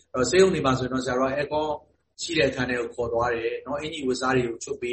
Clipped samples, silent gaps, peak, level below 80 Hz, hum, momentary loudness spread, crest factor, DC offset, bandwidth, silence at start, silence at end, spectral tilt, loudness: under 0.1%; none; -6 dBFS; -50 dBFS; none; 11 LU; 18 dB; under 0.1%; 8.8 kHz; 0.15 s; 0 s; -4.5 dB/octave; -25 LUFS